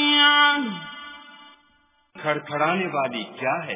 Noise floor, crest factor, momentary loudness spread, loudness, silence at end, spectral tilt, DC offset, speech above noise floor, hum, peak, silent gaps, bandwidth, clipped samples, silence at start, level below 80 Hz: -63 dBFS; 18 dB; 23 LU; -21 LUFS; 0 s; -7 dB/octave; under 0.1%; 38 dB; none; -6 dBFS; none; 3.8 kHz; under 0.1%; 0 s; -68 dBFS